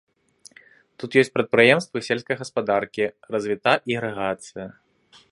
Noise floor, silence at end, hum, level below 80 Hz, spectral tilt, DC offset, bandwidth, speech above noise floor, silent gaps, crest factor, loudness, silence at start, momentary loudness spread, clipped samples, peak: -56 dBFS; 0.6 s; none; -64 dBFS; -5 dB/octave; under 0.1%; 11.5 kHz; 34 dB; none; 22 dB; -22 LUFS; 1 s; 16 LU; under 0.1%; -2 dBFS